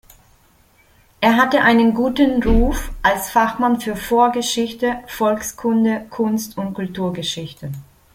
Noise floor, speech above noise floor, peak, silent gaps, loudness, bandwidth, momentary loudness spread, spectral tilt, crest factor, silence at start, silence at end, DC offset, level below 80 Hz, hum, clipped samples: -54 dBFS; 37 dB; -2 dBFS; none; -18 LUFS; 16.5 kHz; 12 LU; -4.5 dB/octave; 18 dB; 1.2 s; 0.3 s; under 0.1%; -30 dBFS; none; under 0.1%